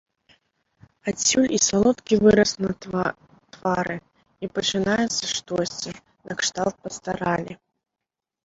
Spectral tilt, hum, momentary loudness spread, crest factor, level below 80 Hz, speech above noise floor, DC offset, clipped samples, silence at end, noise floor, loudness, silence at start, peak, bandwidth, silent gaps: -3.5 dB/octave; none; 15 LU; 20 dB; -52 dBFS; 63 dB; under 0.1%; under 0.1%; 0.9 s; -86 dBFS; -23 LUFS; 1.05 s; -4 dBFS; 8 kHz; none